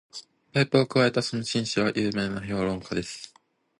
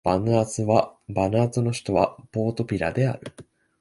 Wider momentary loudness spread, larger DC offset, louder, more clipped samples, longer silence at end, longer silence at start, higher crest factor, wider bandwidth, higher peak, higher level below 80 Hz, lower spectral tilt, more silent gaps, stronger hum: first, 18 LU vs 6 LU; neither; about the same, -26 LUFS vs -24 LUFS; neither; first, 0.55 s vs 0.4 s; about the same, 0.15 s vs 0.05 s; about the same, 20 dB vs 20 dB; about the same, 11.5 kHz vs 11.5 kHz; about the same, -6 dBFS vs -4 dBFS; second, -56 dBFS vs -48 dBFS; second, -5 dB/octave vs -6.5 dB/octave; neither; neither